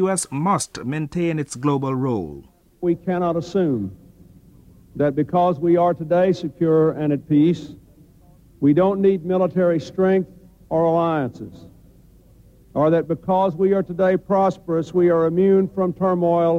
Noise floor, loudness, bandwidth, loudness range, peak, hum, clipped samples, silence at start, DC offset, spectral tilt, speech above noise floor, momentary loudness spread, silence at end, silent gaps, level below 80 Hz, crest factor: -50 dBFS; -20 LUFS; 13.5 kHz; 5 LU; -6 dBFS; none; under 0.1%; 0 s; under 0.1%; -7 dB/octave; 31 dB; 9 LU; 0 s; none; -54 dBFS; 14 dB